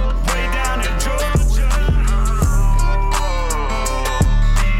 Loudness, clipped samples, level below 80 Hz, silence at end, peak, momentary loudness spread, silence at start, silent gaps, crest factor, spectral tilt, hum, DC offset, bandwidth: -19 LUFS; under 0.1%; -16 dBFS; 0 s; -4 dBFS; 3 LU; 0 s; none; 10 dB; -4.5 dB/octave; none; under 0.1%; 14.5 kHz